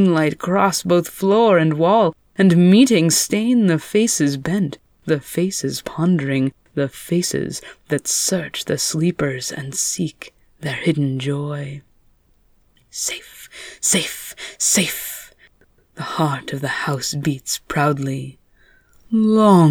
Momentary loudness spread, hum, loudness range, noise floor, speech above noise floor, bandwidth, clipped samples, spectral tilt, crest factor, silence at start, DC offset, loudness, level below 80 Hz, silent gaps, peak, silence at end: 16 LU; none; 9 LU; -57 dBFS; 39 dB; over 20 kHz; under 0.1%; -4.5 dB/octave; 18 dB; 0 s; under 0.1%; -18 LUFS; -56 dBFS; none; -2 dBFS; 0 s